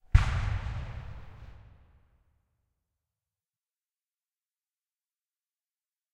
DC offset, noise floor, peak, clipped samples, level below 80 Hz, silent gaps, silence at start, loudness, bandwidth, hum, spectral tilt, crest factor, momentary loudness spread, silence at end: under 0.1%; under -90 dBFS; -6 dBFS; under 0.1%; -38 dBFS; none; 0.15 s; -32 LUFS; 9.6 kHz; none; -6 dB/octave; 30 dB; 25 LU; 4.5 s